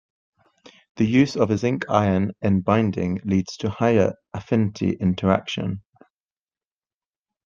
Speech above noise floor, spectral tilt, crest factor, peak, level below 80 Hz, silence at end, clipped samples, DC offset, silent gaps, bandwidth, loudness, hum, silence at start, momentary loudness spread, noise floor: over 69 dB; -7 dB/octave; 22 dB; -2 dBFS; -58 dBFS; 1.65 s; under 0.1%; under 0.1%; none; 7.4 kHz; -22 LUFS; none; 0.95 s; 9 LU; under -90 dBFS